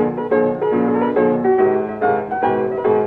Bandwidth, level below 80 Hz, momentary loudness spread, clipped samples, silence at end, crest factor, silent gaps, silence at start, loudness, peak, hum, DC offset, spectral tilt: 4.1 kHz; -54 dBFS; 3 LU; under 0.1%; 0 s; 12 dB; none; 0 s; -17 LUFS; -4 dBFS; none; under 0.1%; -10 dB/octave